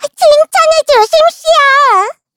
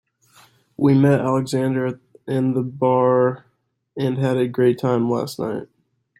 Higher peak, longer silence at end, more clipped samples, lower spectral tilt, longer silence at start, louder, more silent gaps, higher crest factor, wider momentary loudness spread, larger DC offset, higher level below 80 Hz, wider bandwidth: first, 0 dBFS vs -4 dBFS; second, 0.25 s vs 0.55 s; first, 0.4% vs under 0.1%; second, 0.5 dB/octave vs -8 dB/octave; second, 0 s vs 0.8 s; first, -8 LUFS vs -20 LUFS; neither; second, 8 dB vs 16 dB; second, 3 LU vs 11 LU; neither; first, -48 dBFS vs -62 dBFS; first, 18 kHz vs 15.5 kHz